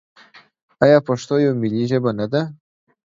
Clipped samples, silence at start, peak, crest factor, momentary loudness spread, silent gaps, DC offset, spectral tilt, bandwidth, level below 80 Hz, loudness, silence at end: under 0.1%; 0.35 s; 0 dBFS; 20 dB; 8 LU; 0.62-0.69 s; under 0.1%; -7 dB/octave; 7.8 kHz; -58 dBFS; -18 LUFS; 0.5 s